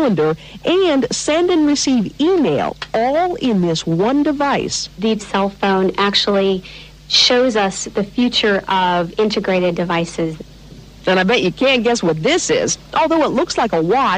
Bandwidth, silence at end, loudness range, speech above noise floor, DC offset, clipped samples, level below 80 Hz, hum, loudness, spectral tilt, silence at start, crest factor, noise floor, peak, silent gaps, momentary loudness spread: 10 kHz; 0 s; 2 LU; 22 dB; under 0.1%; under 0.1%; -44 dBFS; none; -16 LUFS; -4 dB/octave; 0 s; 14 dB; -38 dBFS; -2 dBFS; none; 6 LU